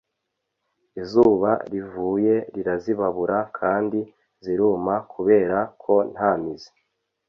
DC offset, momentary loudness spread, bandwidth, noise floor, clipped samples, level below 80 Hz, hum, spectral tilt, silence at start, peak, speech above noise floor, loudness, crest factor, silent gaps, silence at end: under 0.1%; 13 LU; 6.4 kHz; -79 dBFS; under 0.1%; -58 dBFS; none; -8.5 dB/octave; 0.95 s; -4 dBFS; 58 dB; -22 LUFS; 18 dB; none; 0.65 s